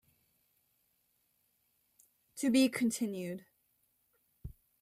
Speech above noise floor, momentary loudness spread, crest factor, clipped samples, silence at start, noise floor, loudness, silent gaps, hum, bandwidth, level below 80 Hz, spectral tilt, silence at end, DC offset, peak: 45 dB; 24 LU; 20 dB; under 0.1%; 2.35 s; -77 dBFS; -32 LUFS; none; none; 16 kHz; -66 dBFS; -4 dB/octave; 0.3 s; under 0.1%; -18 dBFS